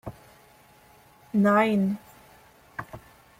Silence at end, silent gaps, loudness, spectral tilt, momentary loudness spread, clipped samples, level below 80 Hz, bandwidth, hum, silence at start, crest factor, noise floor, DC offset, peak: 0.4 s; none; -24 LUFS; -7.5 dB/octave; 24 LU; under 0.1%; -60 dBFS; 15.5 kHz; none; 0.05 s; 20 dB; -56 dBFS; under 0.1%; -8 dBFS